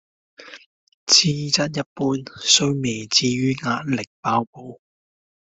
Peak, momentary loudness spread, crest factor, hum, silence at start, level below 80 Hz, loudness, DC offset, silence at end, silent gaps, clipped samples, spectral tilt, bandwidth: 0 dBFS; 10 LU; 22 dB; none; 0.4 s; -60 dBFS; -19 LUFS; under 0.1%; 0.65 s; 0.66-0.87 s, 0.94-1.07 s, 1.86-1.96 s, 4.07-4.23 s, 4.47-4.53 s; under 0.1%; -3 dB/octave; 8.2 kHz